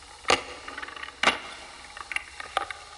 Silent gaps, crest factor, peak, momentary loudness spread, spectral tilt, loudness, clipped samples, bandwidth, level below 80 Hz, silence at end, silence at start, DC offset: none; 26 dB; -6 dBFS; 16 LU; -1 dB/octave; -29 LUFS; under 0.1%; 11.5 kHz; -58 dBFS; 0 s; 0 s; under 0.1%